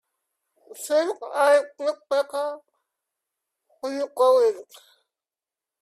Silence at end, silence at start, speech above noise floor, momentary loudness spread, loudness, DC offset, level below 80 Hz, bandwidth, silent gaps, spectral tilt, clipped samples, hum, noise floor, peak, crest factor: 1.2 s; 0.7 s; over 67 dB; 16 LU; -23 LUFS; under 0.1%; -80 dBFS; 14 kHz; none; -1 dB/octave; under 0.1%; none; under -90 dBFS; -8 dBFS; 18 dB